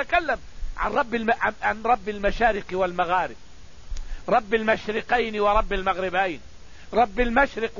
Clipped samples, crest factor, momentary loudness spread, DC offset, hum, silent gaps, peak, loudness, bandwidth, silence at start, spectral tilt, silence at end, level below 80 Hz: under 0.1%; 18 dB; 10 LU; 0.9%; none; none; -6 dBFS; -24 LUFS; 7.4 kHz; 0 s; -5 dB/octave; 0 s; -36 dBFS